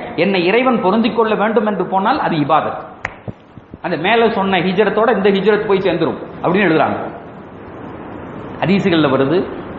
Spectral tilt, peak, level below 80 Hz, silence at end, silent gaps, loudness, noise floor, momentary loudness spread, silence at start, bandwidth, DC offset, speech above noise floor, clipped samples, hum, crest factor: -8 dB/octave; 0 dBFS; -50 dBFS; 0 s; none; -15 LUFS; -38 dBFS; 17 LU; 0 s; 7.2 kHz; under 0.1%; 24 dB; under 0.1%; none; 16 dB